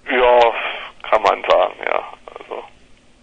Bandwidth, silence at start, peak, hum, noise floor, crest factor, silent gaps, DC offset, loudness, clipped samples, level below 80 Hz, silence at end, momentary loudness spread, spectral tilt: 8.2 kHz; 0.05 s; 0 dBFS; none; -48 dBFS; 18 dB; none; under 0.1%; -16 LUFS; under 0.1%; -46 dBFS; 0.55 s; 20 LU; -3.5 dB/octave